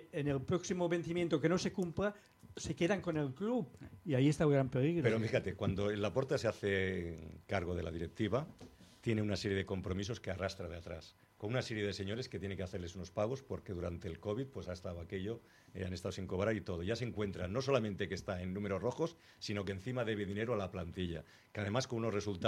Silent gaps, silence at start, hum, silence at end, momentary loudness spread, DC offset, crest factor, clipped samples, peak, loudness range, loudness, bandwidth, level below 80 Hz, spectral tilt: none; 0 s; none; 0 s; 12 LU; under 0.1%; 20 dB; under 0.1%; -18 dBFS; 7 LU; -38 LUFS; 14.5 kHz; -62 dBFS; -6 dB/octave